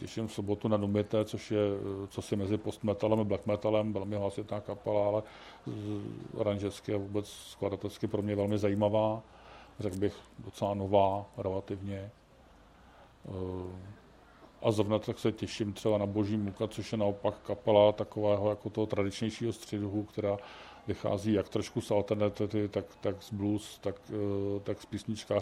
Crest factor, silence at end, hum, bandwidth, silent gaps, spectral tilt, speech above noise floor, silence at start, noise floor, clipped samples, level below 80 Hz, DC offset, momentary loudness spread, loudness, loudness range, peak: 22 dB; 0 s; none; 14 kHz; none; -7 dB/octave; 26 dB; 0 s; -59 dBFS; under 0.1%; -64 dBFS; under 0.1%; 11 LU; -33 LUFS; 5 LU; -10 dBFS